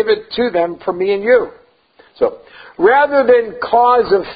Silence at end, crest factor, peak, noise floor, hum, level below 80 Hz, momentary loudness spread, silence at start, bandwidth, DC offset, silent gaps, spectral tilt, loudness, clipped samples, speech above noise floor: 0 s; 14 dB; 0 dBFS; -50 dBFS; none; -52 dBFS; 8 LU; 0 s; 5 kHz; under 0.1%; none; -10 dB/octave; -14 LUFS; under 0.1%; 36 dB